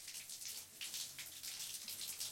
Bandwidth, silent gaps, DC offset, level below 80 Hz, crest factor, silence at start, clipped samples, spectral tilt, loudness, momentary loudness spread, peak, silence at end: 17 kHz; none; under 0.1%; -84 dBFS; 20 dB; 0 s; under 0.1%; 1.5 dB/octave; -45 LUFS; 3 LU; -28 dBFS; 0 s